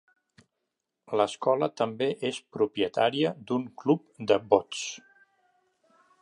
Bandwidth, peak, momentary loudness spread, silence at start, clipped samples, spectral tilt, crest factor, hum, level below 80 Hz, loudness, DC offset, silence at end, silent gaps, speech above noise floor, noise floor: 11 kHz; -6 dBFS; 8 LU; 1.1 s; under 0.1%; -5 dB/octave; 24 dB; none; -72 dBFS; -28 LUFS; under 0.1%; 1.25 s; none; 56 dB; -83 dBFS